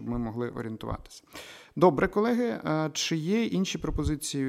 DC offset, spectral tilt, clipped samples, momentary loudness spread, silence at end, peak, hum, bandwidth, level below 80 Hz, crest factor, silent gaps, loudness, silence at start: under 0.1%; -5 dB/octave; under 0.1%; 17 LU; 0 s; -8 dBFS; none; 16 kHz; -44 dBFS; 20 dB; none; -28 LUFS; 0 s